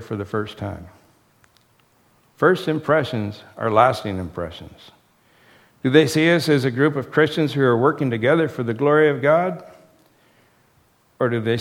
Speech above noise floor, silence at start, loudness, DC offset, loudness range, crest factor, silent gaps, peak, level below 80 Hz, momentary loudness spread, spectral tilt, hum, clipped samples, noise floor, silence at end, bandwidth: 40 dB; 0 s; -19 LUFS; under 0.1%; 5 LU; 20 dB; none; 0 dBFS; -56 dBFS; 14 LU; -6.5 dB/octave; none; under 0.1%; -59 dBFS; 0 s; 16 kHz